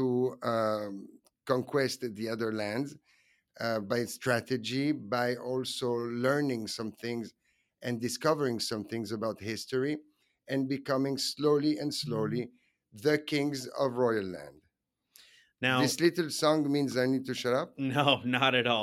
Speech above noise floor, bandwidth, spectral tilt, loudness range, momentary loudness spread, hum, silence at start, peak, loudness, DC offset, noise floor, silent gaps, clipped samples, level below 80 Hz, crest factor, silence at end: 47 dB; 16 kHz; -4.5 dB/octave; 4 LU; 10 LU; none; 0 s; -8 dBFS; -31 LUFS; under 0.1%; -78 dBFS; none; under 0.1%; -74 dBFS; 22 dB; 0 s